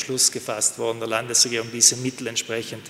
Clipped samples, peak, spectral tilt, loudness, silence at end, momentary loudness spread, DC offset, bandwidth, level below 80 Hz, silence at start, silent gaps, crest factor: under 0.1%; 0 dBFS; -1 dB/octave; -20 LUFS; 0 s; 11 LU; under 0.1%; 16 kHz; -68 dBFS; 0 s; none; 22 dB